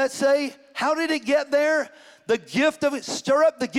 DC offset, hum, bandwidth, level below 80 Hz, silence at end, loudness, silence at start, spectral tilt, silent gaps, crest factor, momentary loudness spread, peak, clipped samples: under 0.1%; none; 15 kHz; -68 dBFS; 0 s; -23 LUFS; 0 s; -3.5 dB/octave; none; 14 dB; 8 LU; -10 dBFS; under 0.1%